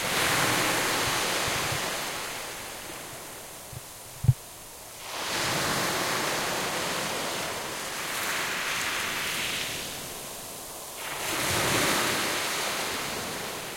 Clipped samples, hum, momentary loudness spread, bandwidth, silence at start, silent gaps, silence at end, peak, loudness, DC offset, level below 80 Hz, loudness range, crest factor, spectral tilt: under 0.1%; none; 14 LU; 16.5 kHz; 0 s; none; 0 s; -8 dBFS; -28 LUFS; under 0.1%; -54 dBFS; 4 LU; 22 dB; -2.5 dB/octave